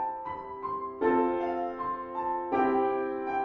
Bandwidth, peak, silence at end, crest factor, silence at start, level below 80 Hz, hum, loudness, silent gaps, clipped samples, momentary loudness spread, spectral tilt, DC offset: 5.8 kHz; -14 dBFS; 0 s; 16 dB; 0 s; -62 dBFS; none; -30 LUFS; none; under 0.1%; 9 LU; -8 dB/octave; under 0.1%